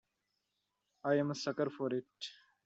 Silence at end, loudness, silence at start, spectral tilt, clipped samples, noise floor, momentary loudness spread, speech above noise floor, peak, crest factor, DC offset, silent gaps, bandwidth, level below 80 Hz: 0.35 s; -37 LUFS; 1.05 s; -5.5 dB/octave; under 0.1%; -85 dBFS; 14 LU; 49 dB; -18 dBFS; 20 dB; under 0.1%; none; 8 kHz; -84 dBFS